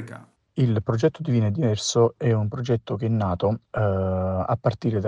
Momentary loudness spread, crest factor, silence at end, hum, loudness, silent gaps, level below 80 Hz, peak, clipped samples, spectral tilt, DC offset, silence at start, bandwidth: 5 LU; 16 dB; 0 s; none; -24 LUFS; none; -52 dBFS; -6 dBFS; under 0.1%; -6.5 dB/octave; under 0.1%; 0 s; 9.8 kHz